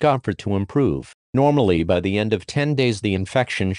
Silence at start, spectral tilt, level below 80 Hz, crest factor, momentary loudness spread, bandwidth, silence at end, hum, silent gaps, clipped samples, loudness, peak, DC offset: 0 s; -6.5 dB/octave; -46 dBFS; 16 dB; 6 LU; 10.5 kHz; 0 s; none; 1.14-1.33 s; under 0.1%; -21 LUFS; -4 dBFS; under 0.1%